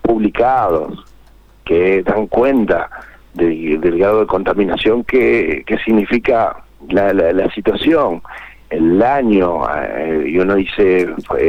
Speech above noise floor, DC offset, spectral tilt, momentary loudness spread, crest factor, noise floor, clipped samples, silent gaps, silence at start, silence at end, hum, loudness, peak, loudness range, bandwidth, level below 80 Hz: 30 dB; under 0.1%; -8 dB/octave; 9 LU; 12 dB; -44 dBFS; under 0.1%; none; 0.05 s; 0 s; none; -14 LUFS; -2 dBFS; 1 LU; 15 kHz; -38 dBFS